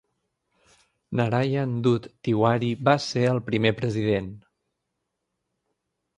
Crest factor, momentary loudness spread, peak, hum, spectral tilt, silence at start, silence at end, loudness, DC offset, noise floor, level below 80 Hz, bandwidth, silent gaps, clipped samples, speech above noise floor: 22 dB; 5 LU; -4 dBFS; none; -7 dB/octave; 1.1 s; 1.8 s; -24 LUFS; under 0.1%; -80 dBFS; -58 dBFS; 10 kHz; none; under 0.1%; 57 dB